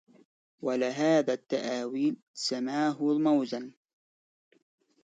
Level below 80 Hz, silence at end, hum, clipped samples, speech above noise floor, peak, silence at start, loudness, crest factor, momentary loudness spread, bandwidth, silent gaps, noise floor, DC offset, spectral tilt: -82 dBFS; 1.35 s; none; under 0.1%; over 61 dB; -14 dBFS; 0.6 s; -29 LUFS; 16 dB; 10 LU; 9.2 kHz; 2.22-2.34 s; under -90 dBFS; under 0.1%; -5 dB/octave